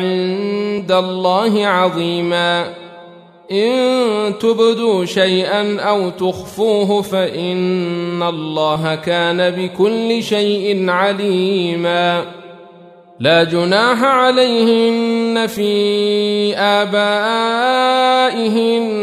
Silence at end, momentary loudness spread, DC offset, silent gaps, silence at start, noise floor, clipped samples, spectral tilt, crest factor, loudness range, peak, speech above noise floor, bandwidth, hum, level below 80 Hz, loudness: 0 s; 6 LU; under 0.1%; none; 0 s; -41 dBFS; under 0.1%; -5 dB/octave; 14 dB; 3 LU; -2 dBFS; 27 dB; 15 kHz; none; -60 dBFS; -15 LUFS